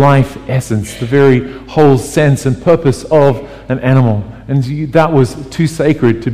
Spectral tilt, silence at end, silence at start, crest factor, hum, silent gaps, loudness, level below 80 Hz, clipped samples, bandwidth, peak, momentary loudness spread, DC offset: -7.5 dB/octave; 0 s; 0 s; 12 dB; none; none; -12 LUFS; -38 dBFS; under 0.1%; 14.5 kHz; 0 dBFS; 8 LU; 2%